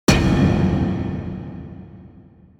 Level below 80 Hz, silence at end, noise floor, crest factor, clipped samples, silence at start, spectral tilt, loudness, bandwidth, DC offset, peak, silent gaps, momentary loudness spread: -32 dBFS; 0.55 s; -47 dBFS; 20 dB; under 0.1%; 0.1 s; -6 dB/octave; -19 LUFS; 17.5 kHz; under 0.1%; 0 dBFS; none; 21 LU